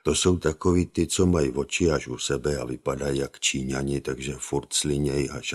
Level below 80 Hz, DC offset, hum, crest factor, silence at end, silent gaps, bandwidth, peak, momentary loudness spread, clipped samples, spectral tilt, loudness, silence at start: -42 dBFS; under 0.1%; none; 18 dB; 0 s; none; 13.5 kHz; -6 dBFS; 7 LU; under 0.1%; -4.5 dB/octave; -25 LUFS; 0.05 s